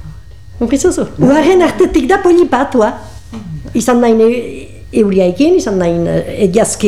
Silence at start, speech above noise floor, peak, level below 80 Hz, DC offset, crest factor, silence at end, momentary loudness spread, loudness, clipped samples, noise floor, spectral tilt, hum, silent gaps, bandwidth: 0.05 s; 22 dB; 0 dBFS; -34 dBFS; 2%; 12 dB; 0 s; 17 LU; -11 LUFS; under 0.1%; -32 dBFS; -5.5 dB/octave; none; none; 13.5 kHz